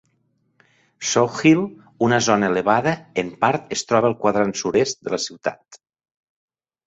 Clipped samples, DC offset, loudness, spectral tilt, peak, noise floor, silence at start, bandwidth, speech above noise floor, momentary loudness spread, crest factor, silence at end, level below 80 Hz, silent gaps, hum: under 0.1%; under 0.1%; -20 LUFS; -4.5 dB/octave; -2 dBFS; -67 dBFS; 1 s; 8 kHz; 47 dB; 9 LU; 20 dB; 1.1 s; -60 dBFS; none; none